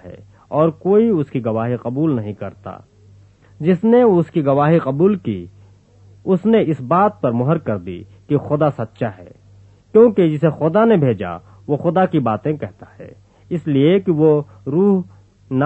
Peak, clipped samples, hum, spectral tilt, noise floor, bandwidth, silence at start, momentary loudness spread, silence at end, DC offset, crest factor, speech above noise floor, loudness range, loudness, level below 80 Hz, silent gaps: 0 dBFS; under 0.1%; none; -10 dB/octave; -47 dBFS; 7.8 kHz; 0.05 s; 14 LU; 0 s; under 0.1%; 16 dB; 31 dB; 3 LU; -17 LUFS; -56 dBFS; none